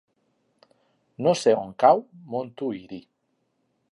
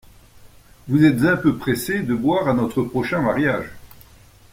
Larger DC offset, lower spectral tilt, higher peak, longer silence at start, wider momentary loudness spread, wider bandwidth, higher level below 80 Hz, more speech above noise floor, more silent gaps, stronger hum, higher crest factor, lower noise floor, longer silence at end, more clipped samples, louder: neither; about the same, -5.5 dB/octave vs -6.5 dB/octave; about the same, -4 dBFS vs -4 dBFS; first, 1.2 s vs 0.4 s; first, 17 LU vs 7 LU; second, 11.5 kHz vs 16.5 kHz; second, -72 dBFS vs -48 dBFS; first, 50 dB vs 29 dB; neither; neither; about the same, 22 dB vs 18 dB; first, -73 dBFS vs -48 dBFS; first, 0.9 s vs 0.65 s; neither; second, -23 LUFS vs -20 LUFS